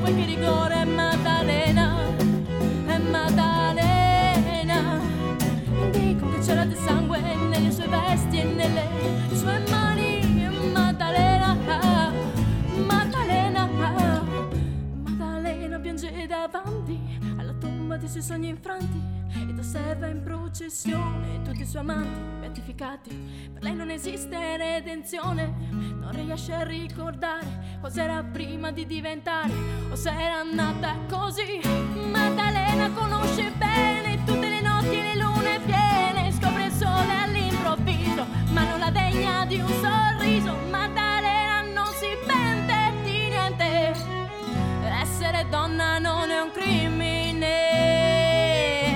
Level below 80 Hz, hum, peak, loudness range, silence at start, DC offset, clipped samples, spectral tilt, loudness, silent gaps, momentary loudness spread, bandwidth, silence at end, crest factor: -38 dBFS; none; -8 dBFS; 9 LU; 0 s; under 0.1%; under 0.1%; -5.5 dB/octave; -24 LUFS; none; 11 LU; 19 kHz; 0 s; 16 dB